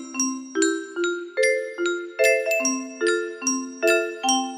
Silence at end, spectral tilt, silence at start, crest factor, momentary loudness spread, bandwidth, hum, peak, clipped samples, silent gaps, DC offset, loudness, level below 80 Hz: 0 s; 0 dB/octave; 0 s; 18 dB; 6 LU; 15.5 kHz; none; -6 dBFS; under 0.1%; none; under 0.1%; -23 LUFS; -72 dBFS